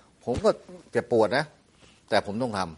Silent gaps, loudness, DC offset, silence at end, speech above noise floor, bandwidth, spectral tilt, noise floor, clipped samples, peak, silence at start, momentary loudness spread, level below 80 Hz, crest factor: none; -27 LUFS; under 0.1%; 0 s; 31 dB; 11.5 kHz; -5.5 dB/octave; -57 dBFS; under 0.1%; -8 dBFS; 0.25 s; 9 LU; -54 dBFS; 20 dB